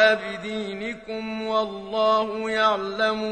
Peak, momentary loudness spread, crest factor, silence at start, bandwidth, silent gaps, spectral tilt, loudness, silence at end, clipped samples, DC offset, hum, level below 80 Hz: -4 dBFS; 10 LU; 18 dB; 0 s; 9.4 kHz; none; -4.5 dB/octave; -25 LUFS; 0 s; under 0.1%; under 0.1%; none; -58 dBFS